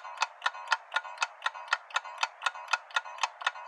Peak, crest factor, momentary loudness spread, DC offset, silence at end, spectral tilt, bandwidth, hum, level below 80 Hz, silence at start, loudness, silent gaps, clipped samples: -10 dBFS; 24 dB; 4 LU; under 0.1%; 0 s; 7.5 dB/octave; 13 kHz; none; under -90 dBFS; 0 s; -33 LUFS; none; under 0.1%